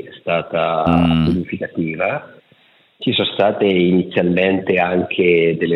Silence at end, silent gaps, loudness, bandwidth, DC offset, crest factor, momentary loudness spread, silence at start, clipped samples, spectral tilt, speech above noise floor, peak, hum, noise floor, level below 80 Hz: 0 s; none; -17 LUFS; 5.4 kHz; under 0.1%; 16 dB; 8 LU; 0 s; under 0.1%; -8.5 dB/octave; 37 dB; -2 dBFS; none; -53 dBFS; -46 dBFS